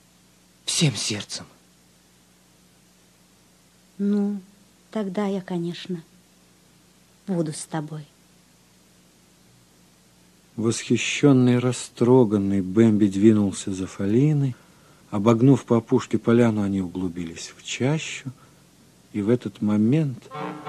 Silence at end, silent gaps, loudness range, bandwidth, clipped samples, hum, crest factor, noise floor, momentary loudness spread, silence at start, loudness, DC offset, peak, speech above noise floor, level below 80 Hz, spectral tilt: 0 s; none; 14 LU; 13 kHz; under 0.1%; 60 Hz at -50 dBFS; 22 dB; -57 dBFS; 16 LU; 0.65 s; -22 LUFS; under 0.1%; -2 dBFS; 35 dB; -56 dBFS; -6 dB/octave